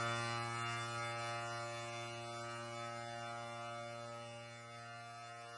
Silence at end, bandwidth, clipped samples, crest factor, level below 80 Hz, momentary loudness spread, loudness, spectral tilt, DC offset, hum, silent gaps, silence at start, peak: 0 s; 11 kHz; under 0.1%; 16 dB; -80 dBFS; 10 LU; -45 LUFS; -4 dB/octave; under 0.1%; none; none; 0 s; -28 dBFS